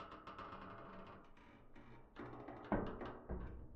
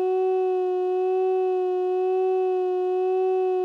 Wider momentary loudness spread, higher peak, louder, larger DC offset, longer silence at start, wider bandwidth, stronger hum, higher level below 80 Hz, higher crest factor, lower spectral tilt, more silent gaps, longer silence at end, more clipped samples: first, 20 LU vs 1 LU; second, -22 dBFS vs -18 dBFS; second, -50 LUFS vs -24 LUFS; neither; about the same, 0 s vs 0 s; first, 7.4 kHz vs 4.6 kHz; neither; first, -58 dBFS vs under -90 dBFS; first, 26 dB vs 6 dB; about the same, -6 dB/octave vs -5.5 dB/octave; neither; about the same, 0 s vs 0 s; neither